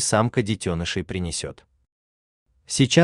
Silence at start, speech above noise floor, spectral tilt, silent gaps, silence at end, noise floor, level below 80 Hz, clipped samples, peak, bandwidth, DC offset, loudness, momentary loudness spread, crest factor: 0 s; over 68 dB; -4.5 dB/octave; 1.92-2.46 s; 0 s; under -90 dBFS; -50 dBFS; under 0.1%; -4 dBFS; 12.5 kHz; under 0.1%; -24 LUFS; 9 LU; 20 dB